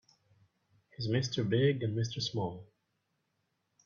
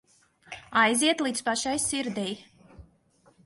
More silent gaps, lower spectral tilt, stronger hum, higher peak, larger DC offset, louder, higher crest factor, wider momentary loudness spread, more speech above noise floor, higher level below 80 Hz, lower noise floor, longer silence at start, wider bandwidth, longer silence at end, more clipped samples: neither; first, -6 dB/octave vs -2 dB/octave; neither; second, -16 dBFS vs -8 dBFS; neither; second, -33 LUFS vs -26 LUFS; about the same, 20 dB vs 20 dB; second, 11 LU vs 19 LU; first, 49 dB vs 37 dB; second, -68 dBFS vs -62 dBFS; first, -81 dBFS vs -63 dBFS; first, 1 s vs 0.5 s; second, 7.2 kHz vs 12 kHz; first, 1.2 s vs 0.65 s; neither